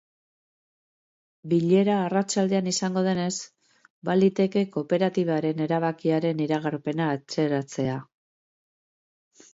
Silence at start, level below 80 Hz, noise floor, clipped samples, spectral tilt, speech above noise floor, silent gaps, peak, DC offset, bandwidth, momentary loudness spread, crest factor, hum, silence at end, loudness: 1.45 s; -70 dBFS; under -90 dBFS; under 0.1%; -6 dB/octave; over 66 dB; 3.90-4.02 s; -10 dBFS; under 0.1%; 8 kHz; 8 LU; 16 dB; none; 1.5 s; -25 LUFS